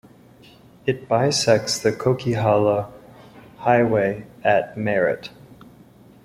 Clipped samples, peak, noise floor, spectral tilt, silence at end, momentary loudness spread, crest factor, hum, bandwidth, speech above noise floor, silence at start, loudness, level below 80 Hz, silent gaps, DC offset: under 0.1%; -4 dBFS; -49 dBFS; -5 dB/octave; 0.95 s; 9 LU; 18 dB; none; 16 kHz; 29 dB; 0.85 s; -21 LUFS; -56 dBFS; none; under 0.1%